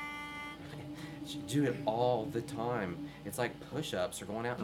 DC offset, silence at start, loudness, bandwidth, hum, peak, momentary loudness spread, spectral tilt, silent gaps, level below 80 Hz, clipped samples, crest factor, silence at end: under 0.1%; 0 s; -37 LUFS; 17.5 kHz; none; -18 dBFS; 12 LU; -5.5 dB/octave; none; -64 dBFS; under 0.1%; 18 dB; 0 s